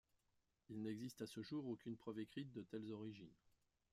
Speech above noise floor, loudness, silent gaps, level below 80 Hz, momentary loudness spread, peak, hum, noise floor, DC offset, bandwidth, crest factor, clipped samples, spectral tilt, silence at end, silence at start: 35 dB; -52 LUFS; none; -84 dBFS; 7 LU; -36 dBFS; none; -86 dBFS; under 0.1%; 15 kHz; 16 dB; under 0.1%; -6.5 dB/octave; 0.6 s; 0.7 s